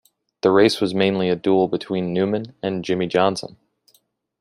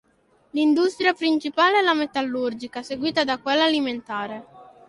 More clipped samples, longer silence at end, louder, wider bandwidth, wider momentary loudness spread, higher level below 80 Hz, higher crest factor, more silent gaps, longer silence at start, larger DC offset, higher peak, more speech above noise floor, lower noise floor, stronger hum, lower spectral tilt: neither; first, 0.95 s vs 0.25 s; about the same, -20 LUFS vs -22 LUFS; about the same, 12.5 kHz vs 11.5 kHz; about the same, 10 LU vs 12 LU; first, -60 dBFS vs -66 dBFS; about the same, 18 dB vs 18 dB; neither; about the same, 0.45 s vs 0.55 s; neither; first, -2 dBFS vs -6 dBFS; about the same, 43 dB vs 40 dB; about the same, -63 dBFS vs -62 dBFS; neither; first, -6 dB/octave vs -3.5 dB/octave